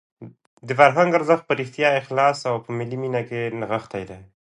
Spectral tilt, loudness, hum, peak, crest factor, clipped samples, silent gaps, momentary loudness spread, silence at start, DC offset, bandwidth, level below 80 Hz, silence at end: -6 dB/octave; -21 LUFS; none; 0 dBFS; 22 dB; under 0.1%; 0.47-0.57 s; 12 LU; 0.2 s; under 0.1%; 11 kHz; -62 dBFS; 0.35 s